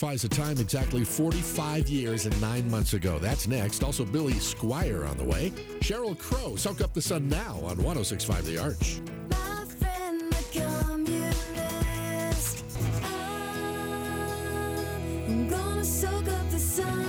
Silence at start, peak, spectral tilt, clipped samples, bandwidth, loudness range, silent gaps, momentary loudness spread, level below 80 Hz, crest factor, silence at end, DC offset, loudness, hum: 0 s; -14 dBFS; -5 dB/octave; under 0.1%; over 20 kHz; 3 LU; none; 5 LU; -36 dBFS; 14 dB; 0 s; under 0.1%; -30 LUFS; none